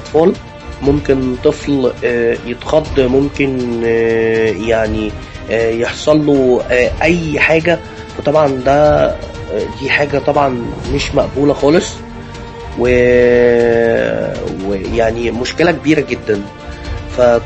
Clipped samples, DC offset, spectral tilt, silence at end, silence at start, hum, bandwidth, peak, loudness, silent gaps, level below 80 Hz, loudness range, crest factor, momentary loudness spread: under 0.1%; under 0.1%; -6 dB/octave; 0 s; 0 s; none; 8.6 kHz; 0 dBFS; -13 LUFS; none; -30 dBFS; 2 LU; 14 dB; 12 LU